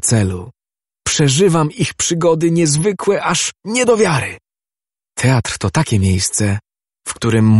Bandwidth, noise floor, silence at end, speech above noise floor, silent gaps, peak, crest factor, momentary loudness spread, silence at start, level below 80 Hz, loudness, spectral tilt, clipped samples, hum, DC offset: 12 kHz; under -90 dBFS; 0 s; over 76 dB; none; 0 dBFS; 16 dB; 12 LU; 0.05 s; -44 dBFS; -15 LUFS; -4.5 dB/octave; under 0.1%; none; under 0.1%